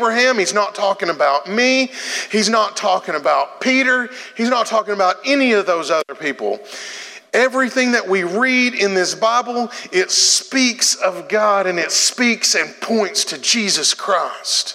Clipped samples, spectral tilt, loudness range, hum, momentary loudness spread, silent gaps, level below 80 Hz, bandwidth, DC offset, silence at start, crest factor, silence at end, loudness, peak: under 0.1%; -1.5 dB/octave; 3 LU; none; 7 LU; none; -84 dBFS; 16 kHz; under 0.1%; 0 s; 16 dB; 0 s; -16 LUFS; 0 dBFS